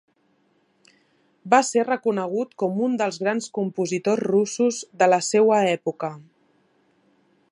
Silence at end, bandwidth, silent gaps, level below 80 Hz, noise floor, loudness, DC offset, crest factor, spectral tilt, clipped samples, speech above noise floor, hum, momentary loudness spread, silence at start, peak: 1.3 s; 11.5 kHz; none; -76 dBFS; -65 dBFS; -22 LUFS; under 0.1%; 20 dB; -4.5 dB/octave; under 0.1%; 44 dB; none; 8 LU; 1.45 s; -2 dBFS